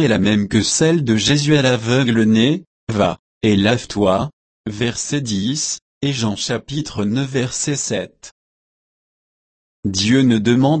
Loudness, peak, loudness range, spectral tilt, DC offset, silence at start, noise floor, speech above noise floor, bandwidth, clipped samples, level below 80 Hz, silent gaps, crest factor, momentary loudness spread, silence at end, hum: -17 LUFS; -2 dBFS; 7 LU; -4.5 dB/octave; under 0.1%; 0 s; under -90 dBFS; over 73 dB; 8.8 kHz; under 0.1%; -48 dBFS; 2.67-2.87 s, 3.19-3.41 s, 4.33-4.64 s, 5.82-6.01 s, 8.31-9.83 s; 16 dB; 9 LU; 0 s; none